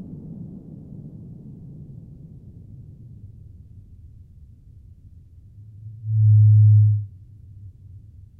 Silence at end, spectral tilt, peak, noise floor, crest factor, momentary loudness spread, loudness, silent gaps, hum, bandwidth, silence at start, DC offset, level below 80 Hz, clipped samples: 1.35 s; -14 dB/octave; -8 dBFS; -47 dBFS; 14 dB; 30 LU; -16 LUFS; none; none; 0.6 kHz; 0 s; under 0.1%; -50 dBFS; under 0.1%